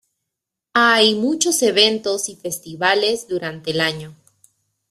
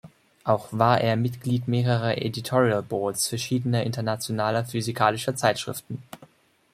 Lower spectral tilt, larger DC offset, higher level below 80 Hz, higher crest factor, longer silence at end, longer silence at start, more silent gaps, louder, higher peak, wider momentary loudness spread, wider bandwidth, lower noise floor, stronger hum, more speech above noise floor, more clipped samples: second, -2 dB/octave vs -5 dB/octave; neither; about the same, -64 dBFS vs -62 dBFS; about the same, 20 dB vs 22 dB; first, 0.8 s vs 0.5 s; first, 0.75 s vs 0.05 s; neither; first, -17 LUFS vs -25 LUFS; first, 0 dBFS vs -4 dBFS; first, 12 LU vs 7 LU; about the same, 14.5 kHz vs 15.5 kHz; first, -83 dBFS vs -57 dBFS; neither; first, 64 dB vs 33 dB; neither